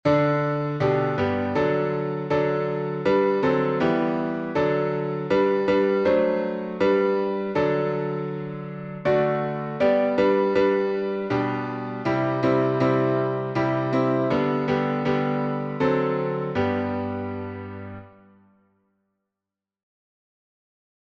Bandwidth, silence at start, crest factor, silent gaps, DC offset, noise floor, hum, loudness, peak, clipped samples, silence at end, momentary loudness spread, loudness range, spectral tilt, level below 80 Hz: 7 kHz; 0.05 s; 16 dB; none; under 0.1%; -88 dBFS; none; -23 LUFS; -8 dBFS; under 0.1%; 2.95 s; 8 LU; 5 LU; -8.5 dB/octave; -58 dBFS